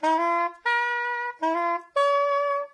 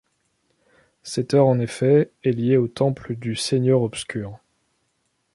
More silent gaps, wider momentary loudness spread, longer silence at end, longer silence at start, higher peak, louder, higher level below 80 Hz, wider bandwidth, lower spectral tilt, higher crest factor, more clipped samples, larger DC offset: neither; second, 5 LU vs 12 LU; second, 0.05 s vs 1 s; second, 0 s vs 1.05 s; second, -12 dBFS vs -4 dBFS; second, -25 LUFS vs -21 LUFS; second, -86 dBFS vs -58 dBFS; second, 10 kHz vs 11.5 kHz; second, -1 dB/octave vs -6.5 dB/octave; second, 12 dB vs 18 dB; neither; neither